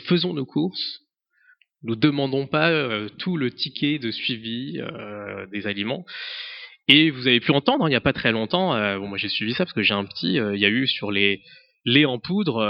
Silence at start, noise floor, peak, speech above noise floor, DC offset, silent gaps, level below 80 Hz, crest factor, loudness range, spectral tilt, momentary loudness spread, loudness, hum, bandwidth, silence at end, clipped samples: 0 s; -60 dBFS; 0 dBFS; 38 dB; under 0.1%; none; -60 dBFS; 24 dB; 7 LU; -7.5 dB/octave; 13 LU; -22 LUFS; none; 5.8 kHz; 0 s; under 0.1%